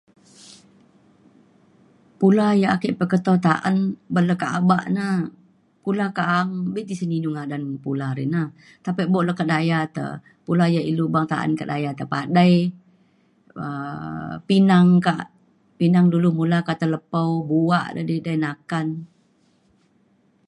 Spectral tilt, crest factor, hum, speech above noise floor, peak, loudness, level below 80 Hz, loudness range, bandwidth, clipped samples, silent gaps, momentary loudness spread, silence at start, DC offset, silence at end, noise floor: -7.5 dB/octave; 20 dB; none; 41 dB; -2 dBFS; -21 LUFS; -64 dBFS; 5 LU; 10.5 kHz; under 0.1%; none; 13 LU; 2.2 s; under 0.1%; 1.45 s; -61 dBFS